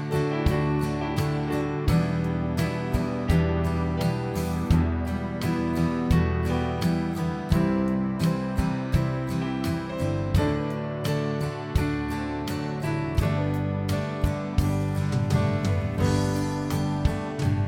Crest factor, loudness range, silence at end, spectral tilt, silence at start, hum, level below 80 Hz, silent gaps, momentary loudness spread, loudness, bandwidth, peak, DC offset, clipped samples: 18 dB; 2 LU; 0 s; -7 dB/octave; 0 s; none; -36 dBFS; none; 5 LU; -26 LUFS; 17.5 kHz; -8 dBFS; under 0.1%; under 0.1%